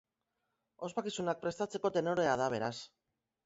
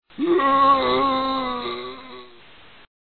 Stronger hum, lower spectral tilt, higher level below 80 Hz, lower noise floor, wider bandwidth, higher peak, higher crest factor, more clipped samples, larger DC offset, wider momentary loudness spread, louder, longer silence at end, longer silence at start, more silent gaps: neither; second, -4 dB/octave vs -7.5 dB/octave; second, -74 dBFS vs -52 dBFS; first, -85 dBFS vs -49 dBFS; first, 8 kHz vs 4.6 kHz; second, -18 dBFS vs -6 dBFS; about the same, 20 dB vs 16 dB; neither; second, under 0.1% vs 0.4%; second, 12 LU vs 19 LU; second, -35 LUFS vs -20 LUFS; second, 0.6 s vs 0.85 s; first, 0.8 s vs 0.2 s; neither